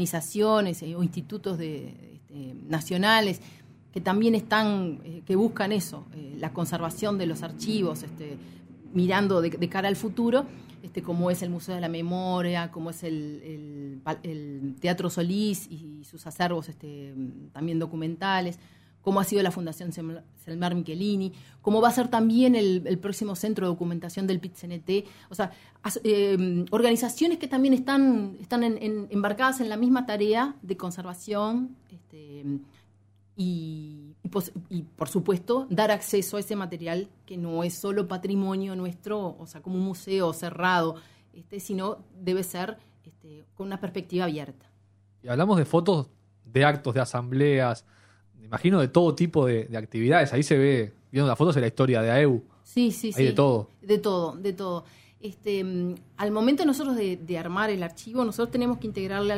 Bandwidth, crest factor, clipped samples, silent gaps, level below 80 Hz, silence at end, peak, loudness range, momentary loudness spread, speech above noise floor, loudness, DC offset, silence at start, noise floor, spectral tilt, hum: 16 kHz; 22 dB; under 0.1%; none; -64 dBFS; 0 s; -4 dBFS; 8 LU; 16 LU; 34 dB; -27 LUFS; under 0.1%; 0 s; -60 dBFS; -6 dB/octave; none